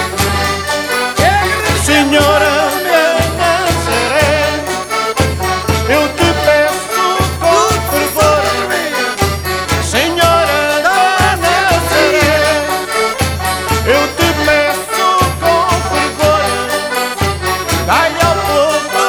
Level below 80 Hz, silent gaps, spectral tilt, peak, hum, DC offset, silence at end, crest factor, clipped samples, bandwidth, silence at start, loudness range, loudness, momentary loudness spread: -30 dBFS; none; -3.5 dB/octave; 0 dBFS; none; under 0.1%; 0 s; 12 dB; under 0.1%; 19.5 kHz; 0 s; 2 LU; -12 LUFS; 5 LU